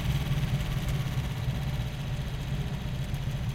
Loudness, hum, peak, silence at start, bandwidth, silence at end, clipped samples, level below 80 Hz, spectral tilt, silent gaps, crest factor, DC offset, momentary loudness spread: -32 LUFS; none; -16 dBFS; 0 s; 16.5 kHz; 0 s; under 0.1%; -36 dBFS; -6 dB/octave; none; 14 dB; under 0.1%; 4 LU